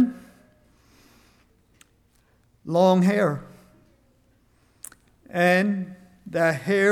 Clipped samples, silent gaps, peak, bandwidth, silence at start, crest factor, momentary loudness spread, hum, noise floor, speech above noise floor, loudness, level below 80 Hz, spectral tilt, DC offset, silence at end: under 0.1%; none; -8 dBFS; 14.5 kHz; 0 s; 18 dB; 25 LU; none; -62 dBFS; 42 dB; -22 LUFS; -64 dBFS; -6.5 dB/octave; under 0.1%; 0 s